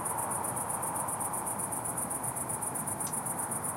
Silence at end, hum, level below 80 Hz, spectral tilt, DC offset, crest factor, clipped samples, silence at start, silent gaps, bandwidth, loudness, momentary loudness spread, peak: 0 s; none; -62 dBFS; -3.5 dB/octave; under 0.1%; 16 dB; under 0.1%; 0 s; none; 16 kHz; -32 LUFS; 1 LU; -18 dBFS